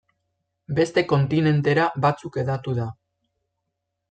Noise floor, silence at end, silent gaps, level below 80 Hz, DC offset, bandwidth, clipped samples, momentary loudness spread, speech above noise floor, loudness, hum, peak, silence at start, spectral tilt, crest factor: -80 dBFS; 1.2 s; none; -60 dBFS; under 0.1%; 8.8 kHz; under 0.1%; 8 LU; 58 dB; -22 LUFS; none; -6 dBFS; 0.7 s; -7.5 dB/octave; 18 dB